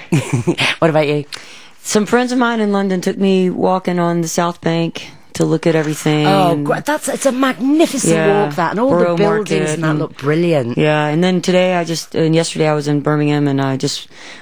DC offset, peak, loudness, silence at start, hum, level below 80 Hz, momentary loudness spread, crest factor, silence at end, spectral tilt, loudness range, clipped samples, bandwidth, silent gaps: 0.9%; 0 dBFS; -15 LUFS; 0 s; none; -56 dBFS; 6 LU; 14 dB; 0 s; -5.5 dB/octave; 2 LU; under 0.1%; over 20 kHz; none